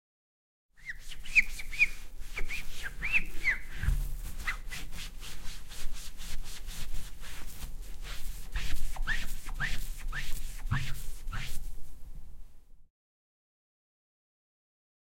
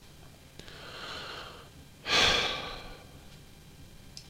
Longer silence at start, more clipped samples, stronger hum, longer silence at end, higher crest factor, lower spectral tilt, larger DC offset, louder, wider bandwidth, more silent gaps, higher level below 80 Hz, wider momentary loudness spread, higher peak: first, 0.8 s vs 0 s; neither; neither; first, 2.25 s vs 0 s; about the same, 20 dB vs 24 dB; about the same, -2.5 dB/octave vs -1.5 dB/octave; neither; second, -35 LUFS vs -28 LUFS; about the same, 16.5 kHz vs 16 kHz; neither; first, -38 dBFS vs -52 dBFS; second, 18 LU vs 28 LU; about the same, -10 dBFS vs -10 dBFS